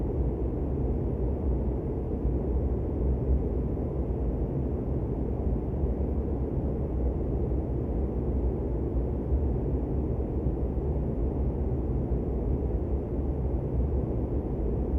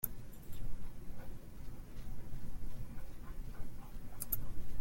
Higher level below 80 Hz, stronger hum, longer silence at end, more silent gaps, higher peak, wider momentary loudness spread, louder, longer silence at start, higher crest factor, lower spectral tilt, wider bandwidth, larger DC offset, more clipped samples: first, -30 dBFS vs -46 dBFS; neither; about the same, 0 s vs 0 s; neither; first, -14 dBFS vs -18 dBFS; second, 2 LU vs 13 LU; first, -30 LUFS vs -48 LUFS; about the same, 0 s vs 0.05 s; about the same, 14 dB vs 18 dB; first, -12.5 dB/octave vs -5 dB/octave; second, 2.8 kHz vs 17 kHz; neither; neither